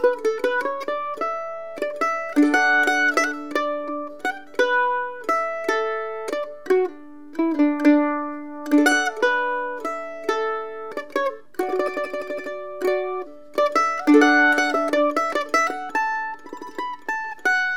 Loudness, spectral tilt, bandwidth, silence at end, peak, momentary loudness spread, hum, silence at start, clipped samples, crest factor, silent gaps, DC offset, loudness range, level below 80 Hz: -22 LUFS; -2 dB/octave; 16 kHz; 0 s; -2 dBFS; 13 LU; none; 0 s; under 0.1%; 20 dB; none; 0.7%; 6 LU; -74 dBFS